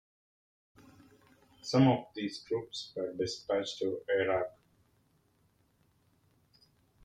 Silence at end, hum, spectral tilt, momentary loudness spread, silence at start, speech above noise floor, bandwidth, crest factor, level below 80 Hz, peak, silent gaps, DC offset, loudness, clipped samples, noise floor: 2.55 s; none; -6 dB/octave; 13 LU; 1.65 s; 39 dB; 9.8 kHz; 22 dB; -72 dBFS; -14 dBFS; none; under 0.1%; -33 LUFS; under 0.1%; -71 dBFS